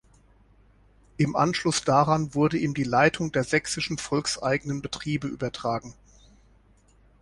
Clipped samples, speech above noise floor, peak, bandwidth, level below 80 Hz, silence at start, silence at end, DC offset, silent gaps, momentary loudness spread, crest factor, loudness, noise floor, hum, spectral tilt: under 0.1%; 34 dB; -6 dBFS; 11.5 kHz; -54 dBFS; 1.2 s; 1.3 s; under 0.1%; none; 9 LU; 20 dB; -25 LUFS; -59 dBFS; none; -5 dB/octave